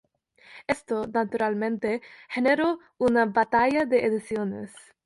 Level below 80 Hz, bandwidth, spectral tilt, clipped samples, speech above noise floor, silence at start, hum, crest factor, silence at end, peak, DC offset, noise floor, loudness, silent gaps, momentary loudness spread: -62 dBFS; 11.5 kHz; -6 dB/octave; under 0.1%; 31 dB; 0.5 s; none; 16 dB; 0.25 s; -10 dBFS; under 0.1%; -56 dBFS; -25 LUFS; none; 11 LU